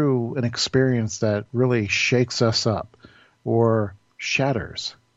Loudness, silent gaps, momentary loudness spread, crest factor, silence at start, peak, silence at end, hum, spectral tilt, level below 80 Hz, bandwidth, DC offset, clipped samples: -22 LUFS; none; 11 LU; 16 dB; 0 s; -6 dBFS; 0.25 s; none; -5 dB/octave; -56 dBFS; 8 kHz; under 0.1%; under 0.1%